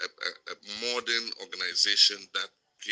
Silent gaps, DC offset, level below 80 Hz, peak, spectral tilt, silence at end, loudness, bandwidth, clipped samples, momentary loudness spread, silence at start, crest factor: none; under 0.1%; -84 dBFS; -8 dBFS; 1.5 dB/octave; 0 s; -26 LUFS; 10.5 kHz; under 0.1%; 18 LU; 0 s; 22 dB